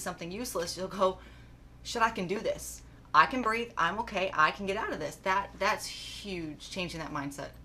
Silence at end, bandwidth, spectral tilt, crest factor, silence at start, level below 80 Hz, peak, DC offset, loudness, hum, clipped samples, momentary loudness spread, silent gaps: 0 s; 15 kHz; -3.5 dB/octave; 26 dB; 0 s; -54 dBFS; -6 dBFS; under 0.1%; -31 LUFS; none; under 0.1%; 12 LU; none